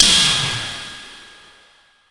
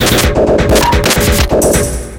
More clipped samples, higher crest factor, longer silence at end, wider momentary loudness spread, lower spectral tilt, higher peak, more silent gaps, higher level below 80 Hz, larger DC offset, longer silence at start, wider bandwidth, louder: neither; first, 20 dB vs 10 dB; first, 0.9 s vs 0 s; first, 24 LU vs 2 LU; second, -0.5 dB/octave vs -4 dB/octave; about the same, 0 dBFS vs 0 dBFS; neither; second, -46 dBFS vs -18 dBFS; neither; about the same, 0 s vs 0 s; second, 11.5 kHz vs 17.5 kHz; second, -15 LUFS vs -10 LUFS